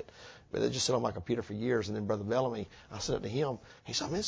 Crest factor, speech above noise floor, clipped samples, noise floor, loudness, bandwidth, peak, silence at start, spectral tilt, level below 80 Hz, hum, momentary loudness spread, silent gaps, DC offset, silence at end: 18 dB; 20 dB; under 0.1%; -54 dBFS; -34 LUFS; 8 kHz; -16 dBFS; 0 s; -4.5 dB/octave; -58 dBFS; none; 12 LU; none; under 0.1%; 0 s